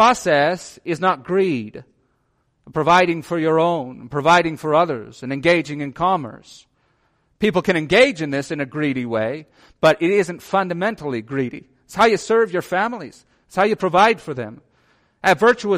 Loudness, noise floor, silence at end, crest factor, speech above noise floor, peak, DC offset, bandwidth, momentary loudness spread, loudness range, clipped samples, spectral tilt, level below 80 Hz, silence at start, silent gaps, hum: -19 LUFS; -66 dBFS; 0 s; 16 dB; 48 dB; -2 dBFS; under 0.1%; 15.5 kHz; 13 LU; 2 LU; under 0.1%; -5 dB/octave; -56 dBFS; 0 s; none; none